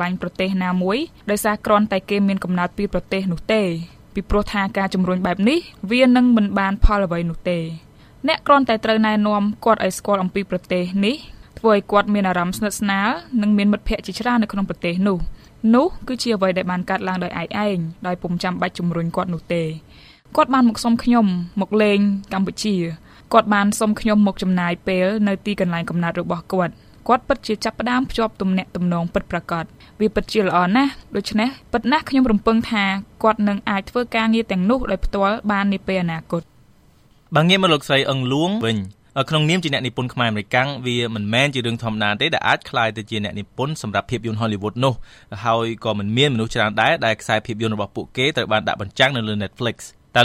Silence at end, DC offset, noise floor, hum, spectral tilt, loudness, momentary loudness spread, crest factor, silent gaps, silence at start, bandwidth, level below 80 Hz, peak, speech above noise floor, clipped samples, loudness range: 0 s; under 0.1%; -53 dBFS; none; -5.5 dB/octave; -20 LUFS; 8 LU; 20 dB; none; 0 s; 15 kHz; -36 dBFS; 0 dBFS; 33 dB; under 0.1%; 3 LU